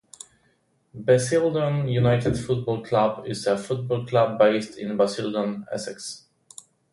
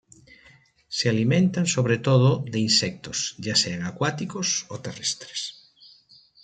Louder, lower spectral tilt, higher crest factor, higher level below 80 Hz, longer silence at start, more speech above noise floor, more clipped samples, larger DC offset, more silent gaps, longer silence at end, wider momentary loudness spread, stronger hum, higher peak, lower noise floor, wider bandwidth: about the same, -24 LUFS vs -23 LUFS; first, -6 dB/octave vs -4 dB/octave; about the same, 18 dB vs 18 dB; first, -54 dBFS vs -62 dBFS; about the same, 0.95 s vs 0.9 s; first, 43 dB vs 32 dB; neither; neither; neither; second, 0.75 s vs 0.9 s; about the same, 13 LU vs 11 LU; neither; about the same, -6 dBFS vs -6 dBFS; first, -66 dBFS vs -56 dBFS; first, 11.5 kHz vs 9.4 kHz